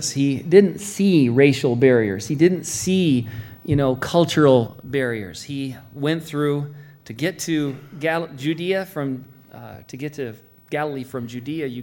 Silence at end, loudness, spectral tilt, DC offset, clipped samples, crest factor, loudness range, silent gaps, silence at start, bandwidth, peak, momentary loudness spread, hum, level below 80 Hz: 0 s; -20 LUFS; -5.5 dB/octave; under 0.1%; under 0.1%; 20 dB; 9 LU; none; 0 s; 17 kHz; 0 dBFS; 17 LU; none; -52 dBFS